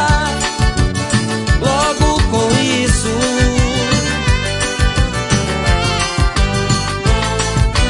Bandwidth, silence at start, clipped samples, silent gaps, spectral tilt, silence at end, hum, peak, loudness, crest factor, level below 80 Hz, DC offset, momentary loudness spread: 11 kHz; 0 s; under 0.1%; none; -4.5 dB/octave; 0 s; none; 0 dBFS; -15 LUFS; 14 dB; -20 dBFS; under 0.1%; 3 LU